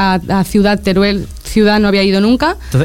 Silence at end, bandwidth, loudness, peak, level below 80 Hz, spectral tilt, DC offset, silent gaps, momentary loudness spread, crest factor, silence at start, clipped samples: 0 s; 16.5 kHz; -12 LUFS; -2 dBFS; -30 dBFS; -6 dB/octave; 1%; none; 4 LU; 10 dB; 0 s; under 0.1%